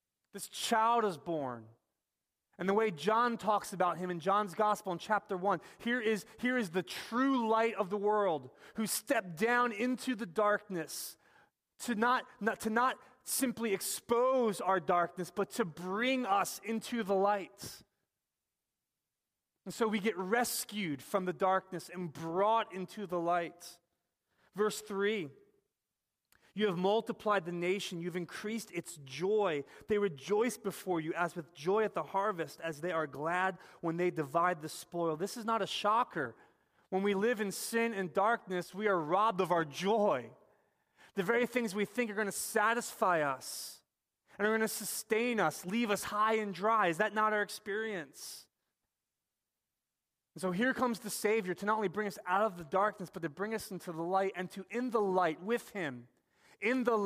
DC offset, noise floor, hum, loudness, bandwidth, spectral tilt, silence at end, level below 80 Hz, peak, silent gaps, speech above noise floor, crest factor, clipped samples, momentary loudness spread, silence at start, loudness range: under 0.1%; under -90 dBFS; none; -34 LUFS; 15.5 kHz; -4 dB/octave; 0 s; -78 dBFS; -16 dBFS; none; over 56 dB; 18 dB; under 0.1%; 10 LU; 0.35 s; 4 LU